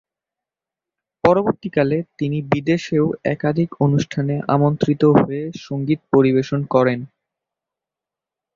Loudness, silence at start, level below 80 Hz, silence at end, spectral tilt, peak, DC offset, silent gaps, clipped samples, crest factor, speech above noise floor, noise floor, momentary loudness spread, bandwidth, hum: -19 LUFS; 1.25 s; -54 dBFS; 1.5 s; -8 dB/octave; -2 dBFS; under 0.1%; none; under 0.1%; 18 dB; 70 dB; -88 dBFS; 8 LU; 7.4 kHz; none